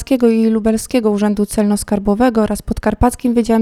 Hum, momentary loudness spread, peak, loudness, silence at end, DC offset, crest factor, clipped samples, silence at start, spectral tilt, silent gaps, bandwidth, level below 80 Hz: none; 4 LU; 0 dBFS; -15 LUFS; 0 s; under 0.1%; 14 dB; under 0.1%; 0 s; -6 dB/octave; none; 14.5 kHz; -30 dBFS